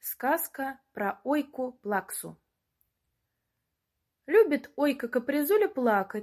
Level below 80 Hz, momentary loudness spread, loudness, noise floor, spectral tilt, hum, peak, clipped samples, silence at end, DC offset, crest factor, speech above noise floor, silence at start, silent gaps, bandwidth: -76 dBFS; 13 LU; -28 LUFS; -83 dBFS; -4.5 dB/octave; none; -10 dBFS; under 0.1%; 0 s; under 0.1%; 18 dB; 55 dB; 0.05 s; none; 16 kHz